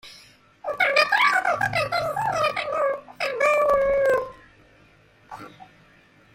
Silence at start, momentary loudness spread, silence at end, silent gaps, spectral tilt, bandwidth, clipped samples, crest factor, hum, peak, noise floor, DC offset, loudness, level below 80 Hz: 0.05 s; 18 LU; 0.7 s; none; -3 dB/octave; 16.5 kHz; under 0.1%; 18 dB; none; -6 dBFS; -55 dBFS; under 0.1%; -22 LUFS; -54 dBFS